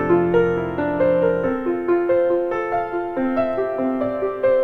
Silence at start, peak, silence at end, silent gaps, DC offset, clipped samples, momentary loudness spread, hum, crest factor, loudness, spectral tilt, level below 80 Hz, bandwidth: 0 s; -4 dBFS; 0 s; none; under 0.1%; under 0.1%; 5 LU; none; 14 dB; -20 LUFS; -9 dB/octave; -48 dBFS; 4.5 kHz